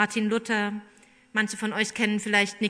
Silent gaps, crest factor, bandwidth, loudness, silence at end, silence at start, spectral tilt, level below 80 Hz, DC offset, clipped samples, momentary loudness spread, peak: none; 18 dB; 11 kHz; -26 LUFS; 0 s; 0 s; -3.5 dB/octave; -72 dBFS; under 0.1%; under 0.1%; 7 LU; -8 dBFS